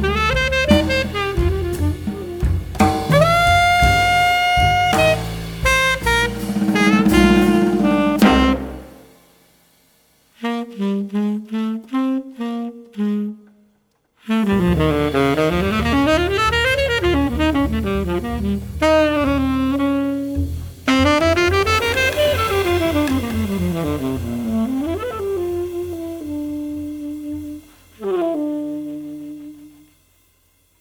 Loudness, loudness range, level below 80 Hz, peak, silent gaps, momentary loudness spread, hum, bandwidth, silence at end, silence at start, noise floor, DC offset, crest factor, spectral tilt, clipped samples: -18 LUFS; 11 LU; -30 dBFS; 0 dBFS; none; 14 LU; none; over 20 kHz; 1.1 s; 0 s; -62 dBFS; under 0.1%; 18 dB; -5.5 dB/octave; under 0.1%